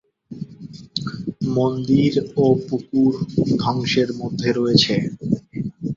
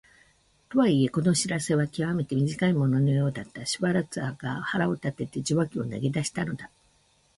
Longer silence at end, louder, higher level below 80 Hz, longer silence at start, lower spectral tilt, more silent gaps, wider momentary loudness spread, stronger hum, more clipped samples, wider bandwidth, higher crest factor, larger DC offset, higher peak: second, 0 s vs 0.7 s; first, -20 LUFS vs -27 LUFS; first, -52 dBFS vs -60 dBFS; second, 0.3 s vs 0.7 s; about the same, -6.5 dB/octave vs -5.5 dB/octave; neither; first, 16 LU vs 9 LU; neither; neither; second, 7.6 kHz vs 11.5 kHz; about the same, 18 dB vs 16 dB; neither; first, -2 dBFS vs -12 dBFS